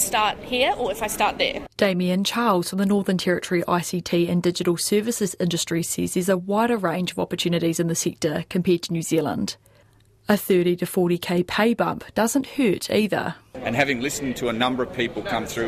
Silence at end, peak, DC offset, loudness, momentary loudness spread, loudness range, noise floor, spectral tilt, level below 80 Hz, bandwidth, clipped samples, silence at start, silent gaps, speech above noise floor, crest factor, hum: 0 s; -6 dBFS; under 0.1%; -23 LUFS; 5 LU; 2 LU; -56 dBFS; -4.5 dB/octave; -52 dBFS; 15.5 kHz; under 0.1%; 0 s; none; 33 dB; 18 dB; none